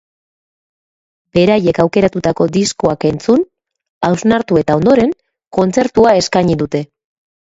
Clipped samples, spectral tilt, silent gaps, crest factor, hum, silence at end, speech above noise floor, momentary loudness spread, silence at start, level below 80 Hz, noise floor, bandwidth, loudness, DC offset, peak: under 0.1%; -6 dB/octave; 3.89-4.01 s, 5.47-5.51 s; 14 dB; none; 0.7 s; over 78 dB; 9 LU; 1.35 s; -44 dBFS; under -90 dBFS; 8 kHz; -13 LUFS; under 0.1%; 0 dBFS